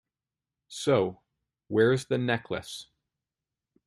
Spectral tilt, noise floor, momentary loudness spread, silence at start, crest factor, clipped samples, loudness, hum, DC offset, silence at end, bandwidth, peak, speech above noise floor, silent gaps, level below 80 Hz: -5.5 dB/octave; under -90 dBFS; 17 LU; 0.7 s; 20 dB; under 0.1%; -28 LUFS; none; under 0.1%; 1.05 s; 12.5 kHz; -10 dBFS; over 63 dB; none; -66 dBFS